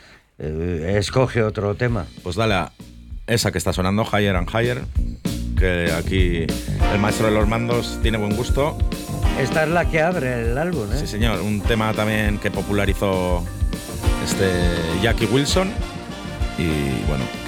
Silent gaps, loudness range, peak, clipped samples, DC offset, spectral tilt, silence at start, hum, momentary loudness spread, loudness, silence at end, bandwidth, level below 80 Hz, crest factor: none; 1 LU; -6 dBFS; under 0.1%; under 0.1%; -5.5 dB/octave; 0.4 s; none; 8 LU; -21 LUFS; 0 s; 17.5 kHz; -28 dBFS; 14 dB